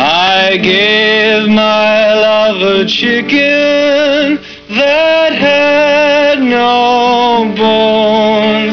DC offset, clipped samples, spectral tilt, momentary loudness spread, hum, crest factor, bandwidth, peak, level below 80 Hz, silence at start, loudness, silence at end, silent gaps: under 0.1%; under 0.1%; -4.5 dB/octave; 3 LU; none; 6 dB; 5.4 kHz; -4 dBFS; -46 dBFS; 0 s; -9 LUFS; 0 s; none